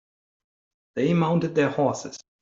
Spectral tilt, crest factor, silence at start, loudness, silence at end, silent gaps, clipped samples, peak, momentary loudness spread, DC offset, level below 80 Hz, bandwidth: -6.5 dB/octave; 16 dB; 0.95 s; -24 LUFS; 0.2 s; none; under 0.1%; -10 dBFS; 13 LU; under 0.1%; -64 dBFS; 7.8 kHz